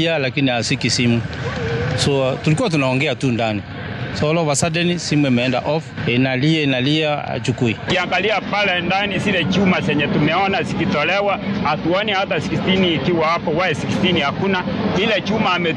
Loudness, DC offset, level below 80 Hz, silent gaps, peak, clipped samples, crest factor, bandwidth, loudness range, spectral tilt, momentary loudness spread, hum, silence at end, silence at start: -18 LUFS; under 0.1%; -44 dBFS; none; -4 dBFS; under 0.1%; 14 dB; 11.5 kHz; 1 LU; -5 dB/octave; 5 LU; none; 0 s; 0 s